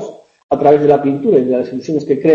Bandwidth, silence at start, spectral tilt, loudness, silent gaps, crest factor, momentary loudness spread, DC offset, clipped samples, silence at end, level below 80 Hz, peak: 7.4 kHz; 0 s; -8.5 dB/octave; -14 LUFS; 0.43-0.49 s; 14 dB; 10 LU; under 0.1%; under 0.1%; 0 s; -54 dBFS; 0 dBFS